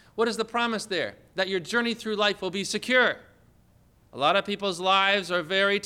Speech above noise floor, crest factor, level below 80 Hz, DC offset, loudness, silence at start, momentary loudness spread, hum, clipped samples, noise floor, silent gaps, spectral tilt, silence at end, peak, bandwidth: 34 dB; 18 dB; -66 dBFS; under 0.1%; -25 LUFS; 0.15 s; 8 LU; none; under 0.1%; -60 dBFS; none; -3 dB/octave; 0 s; -10 dBFS; 16 kHz